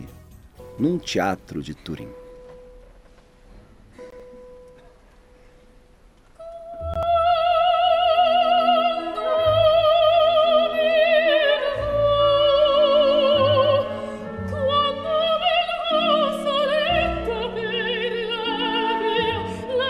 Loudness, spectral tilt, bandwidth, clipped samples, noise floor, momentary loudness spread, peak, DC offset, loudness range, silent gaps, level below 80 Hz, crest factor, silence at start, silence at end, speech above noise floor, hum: -20 LUFS; -5 dB/octave; 12.5 kHz; under 0.1%; -52 dBFS; 14 LU; -6 dBFS; under 0.1%; 11 LU; none; -44 dBFS; 14 dB; 0 s; 0 s; 26 dB; none